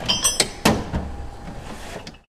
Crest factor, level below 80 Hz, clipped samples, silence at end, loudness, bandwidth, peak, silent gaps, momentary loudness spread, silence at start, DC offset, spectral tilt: 24 dB; -36 dBFS; under 0.1%; 0.1 s; -20 LUFS; 16.5 kHz; 0 dBFS; none; 18 LU; 0 s; under 0.1%; -2.5 dB/octave